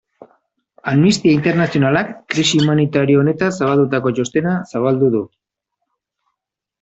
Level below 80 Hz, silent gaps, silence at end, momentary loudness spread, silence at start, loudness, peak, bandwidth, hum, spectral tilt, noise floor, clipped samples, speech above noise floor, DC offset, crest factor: -54 dBFS; none; 1.55 s; 6 LU; 0.2 s; -16 LUFS; -2 dBFS; 8.2 kHz; none; -6 dB/octave; -81 dBFS; under 0.1%; 66 dB; under 0.1%; 16 dB